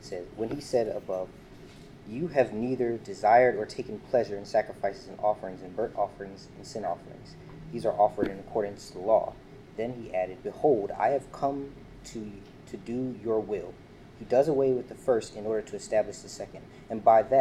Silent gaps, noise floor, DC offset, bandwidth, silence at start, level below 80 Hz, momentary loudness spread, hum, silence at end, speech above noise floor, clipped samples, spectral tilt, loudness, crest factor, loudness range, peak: none; -48 dBFS; under 0.1%; 12.5 kHz; 0 s; -58 dBFS; 19 LU; none; 0 s; 20 dB; under 0.1%; -6 dB/octave; -29 LUFS; 20 dB; 5 LU; -10 dBFS